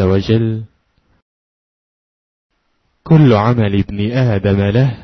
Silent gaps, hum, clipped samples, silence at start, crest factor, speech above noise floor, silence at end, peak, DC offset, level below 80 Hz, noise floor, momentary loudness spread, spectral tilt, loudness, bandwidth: 1.22-2.50 s; none; under 0.1%; 0 s; 14 dB; 51 dB; 0.05 s; -2 dBFS; under 0.1%; -40 dBFS; -63 dBFS; 8 LU; -9 dB/octave; -13 LUFS; 6.2 kHz